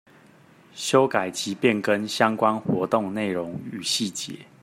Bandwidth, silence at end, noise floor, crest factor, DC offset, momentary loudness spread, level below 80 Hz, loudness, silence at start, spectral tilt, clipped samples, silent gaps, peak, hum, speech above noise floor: 16 kHz; 0.2 s; -53 dBFS; 22 dB; under 0.1%; 10 LU; -68 dBFS; -24 LUFS; 0.75 s; -4 dB/octave; under 0.1%; none; -4 dBFS; none; 29 dB